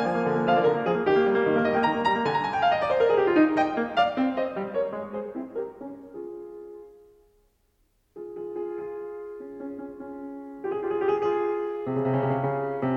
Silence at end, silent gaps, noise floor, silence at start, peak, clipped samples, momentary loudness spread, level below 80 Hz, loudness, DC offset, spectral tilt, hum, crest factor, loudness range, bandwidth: 0 s; none; -68 dBFS; 0 s; -8 dBFS; under 0.1%; 17 LU; -62 dBFS; -25 LUFS; under 0.1%; -7.5 dB/octave; none; 18 dB; 16 LU; 8 kHz